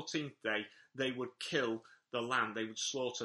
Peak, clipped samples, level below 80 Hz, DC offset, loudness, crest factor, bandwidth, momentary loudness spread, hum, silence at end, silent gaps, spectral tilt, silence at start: -18 dBFS; under 0.1%; -82 dBFS; under 0.1%; -38 LUFS; 20 dB; 11.5 kHz; 7 LU; none; 0 s; none; -3 dB/octave; 0 s